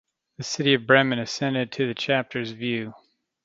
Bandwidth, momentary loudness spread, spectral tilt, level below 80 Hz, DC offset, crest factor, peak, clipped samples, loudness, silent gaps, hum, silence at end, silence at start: 7.8 kHz; 13 LU; -4.5 dB/octave; -68 dBFS; under 0.1%; 24 dB; -2 dBFS; under 0.1%; -23 LUFS; none; none; 0.5 s; 0.4 s